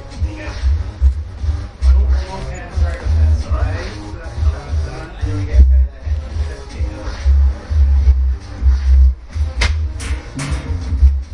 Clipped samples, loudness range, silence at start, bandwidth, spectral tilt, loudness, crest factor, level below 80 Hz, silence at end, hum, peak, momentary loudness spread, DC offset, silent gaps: under 0.1%; 3 LU; 0 s; 10 kHz; -6.5 dB/octave; -18 LUFS; 14 dB; -16 dBFS; 0 s; none; 0 dBFS; 11 LU; under 0.1%; none